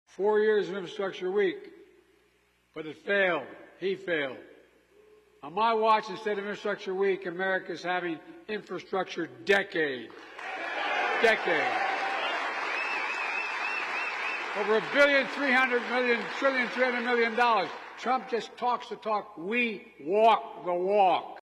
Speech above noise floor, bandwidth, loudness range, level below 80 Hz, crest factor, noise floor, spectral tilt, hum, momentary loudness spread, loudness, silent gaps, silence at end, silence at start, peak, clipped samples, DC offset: 40 dB; 12.5 kHz; 6 LU; -74 dBFS; 16 dB; -68 dBFS; -4 dB/octave; none; 12 LU; -28 LUFS; none; 0 s; 0.2 s; -12 dBFS; under 0.1%; under 0.1%